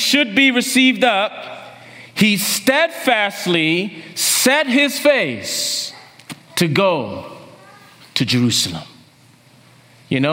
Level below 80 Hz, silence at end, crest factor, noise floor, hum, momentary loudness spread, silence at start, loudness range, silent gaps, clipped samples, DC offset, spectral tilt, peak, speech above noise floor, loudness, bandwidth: -62 dBFS; 0 s; 18 dB; -49 dBFS; none; 16 LU; 0 s; 6 LU; none; under 0.1%; under 0.1%; -3 dB/octave; 0 dBFS; 33 dB; -16 LUFS; 16.5 kHz